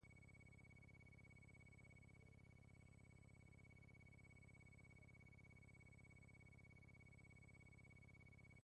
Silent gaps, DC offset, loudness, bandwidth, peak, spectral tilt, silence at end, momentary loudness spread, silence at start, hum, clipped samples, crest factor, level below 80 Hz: none; under 0.1%; -67 LUFS; 10 kHz; -56 dBFS; -6 dB/octave; 0 s; 2 LU; 0 s; 50 Hz at -75 dBFS; under 0.1%; 10 dB; -74 dBFS